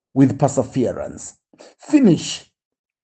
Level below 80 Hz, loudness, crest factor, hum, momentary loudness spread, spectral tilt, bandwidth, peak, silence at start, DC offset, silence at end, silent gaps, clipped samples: -56 dBFS; -18 LUFS; 18 dB; none; 17 LU; -6.5 dB/octave; 9 kHz; -2 dBFS; 0.15 s; under 0.1%; 0.65 s; none; under 0.1%